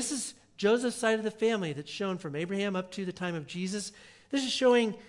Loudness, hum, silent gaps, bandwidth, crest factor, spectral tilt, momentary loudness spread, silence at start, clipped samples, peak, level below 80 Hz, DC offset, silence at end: -31 LUFS; none; none; 12 kHz; 18 dB; -4 dB/octave; 11 LU; 0 s; under 0.1%; -12 dBFS; -72 dBFS; under 0.1%; 0 s